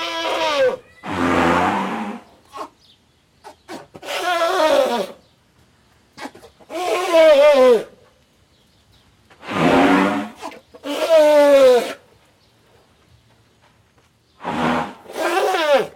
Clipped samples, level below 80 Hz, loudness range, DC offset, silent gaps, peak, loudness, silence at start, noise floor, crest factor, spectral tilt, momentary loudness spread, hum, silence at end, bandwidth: under 0.1%; -56 dBFS; 8 LU; under 0.1%; none; -6 dBFS; -16 LUFS; 0 s; -57 dBFS; 14 dB; -4.5 dB/octave; 25 LU; none; 0.05 s; 17 kHz